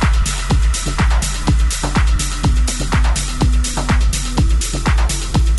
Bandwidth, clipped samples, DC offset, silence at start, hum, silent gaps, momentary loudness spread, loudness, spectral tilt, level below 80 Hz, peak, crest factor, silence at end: 12 kHz; under 0.1%; under 0.1%; 0 s; none; none; 1 LU; -17 LUFS; -4 dB/octave; -16 dBFS; -2 dBFS; 12 dB; 0 s